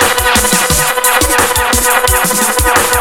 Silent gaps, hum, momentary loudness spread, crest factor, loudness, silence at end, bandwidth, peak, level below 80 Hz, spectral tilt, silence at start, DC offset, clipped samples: none; none; 1 LU; 10 dB; -9 LUFS; 0 s; over 20 kHz; 0 dBFS; -24 dBFS; -2 dB/octave; 0 s; under 0.1%; under 0.1%